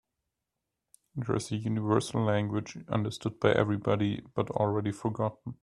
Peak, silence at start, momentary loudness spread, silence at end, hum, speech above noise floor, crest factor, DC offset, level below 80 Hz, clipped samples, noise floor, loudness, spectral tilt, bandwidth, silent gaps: -8 dBFS; 1.15 s; 7 LU; 0.1 s; none; 56 dB; 24 dB; under 0.1%; -62 dBFS; under 0.1%; -86 dBFS; -30 LUFS; -6.5 dB/octave; 12 kHz; none